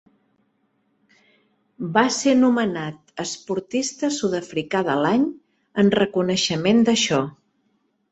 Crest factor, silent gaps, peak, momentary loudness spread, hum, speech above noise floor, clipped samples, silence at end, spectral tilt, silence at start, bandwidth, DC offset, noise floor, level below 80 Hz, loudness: 20 dB; none; -2 dBFS; 13 LU; none; 48 dB; under 0.1%; 0.8 s; -4.5 dB/octave; 1.8 s; 8.2 kHz; under 0.1%; -68 dBFS; -62 dBFS; -21 LUFS